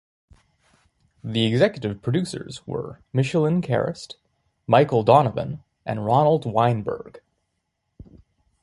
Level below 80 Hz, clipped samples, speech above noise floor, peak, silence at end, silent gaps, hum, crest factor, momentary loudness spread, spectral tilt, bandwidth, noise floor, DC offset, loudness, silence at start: -56 dBFS; under 0.1%; 55 dB; -2 dBFS; 1.45 s; none; none; 22 dB; 17 LU; -7 dB/octave; 11.5 kHz; -76 dBFS; under 0.1%; -22 LUFS; 1.25 s